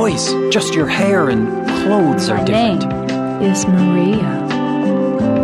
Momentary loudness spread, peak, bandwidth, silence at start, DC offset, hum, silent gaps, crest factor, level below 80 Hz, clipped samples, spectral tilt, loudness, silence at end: 5 LU; -2 dBFS; 12.5 kHz; 0 s; under 0.1%; none; none; 12 dB; -44 dBFS; under 0.1%; -5.5 dB/octave; -15 LUFS; 0 s